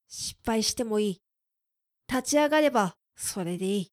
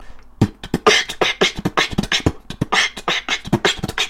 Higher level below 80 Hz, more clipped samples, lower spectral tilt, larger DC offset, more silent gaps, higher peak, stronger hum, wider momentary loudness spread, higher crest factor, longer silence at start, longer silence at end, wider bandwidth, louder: second, -58 dBFS vs -38 dBFS; neither; about the same, -3.5 dB/octave vs -3.5 dB/octave; neither; neither; second, -12 dBFS vs -2 dBFS; neither; first, 11 LU vs 7 LU; about the same, 18 dB vs 18 dB; about the same, 0.1 s vs 0 s; about the same, 0.1 s vs 0 s; about the same, 16 kHz vs 16.5 kHz; second, -27 LUFS vs -18 LUFS